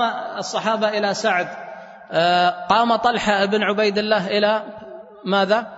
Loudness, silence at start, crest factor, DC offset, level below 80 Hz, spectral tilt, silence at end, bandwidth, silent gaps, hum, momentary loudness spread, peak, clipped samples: -19 LUFS; 0 s; 18 dB; under 0.1%; -58 dBFS; -4 dB/octave; 0 s; 8 kHz; none; none; 17 LU; -2 dBFS; under 0.1%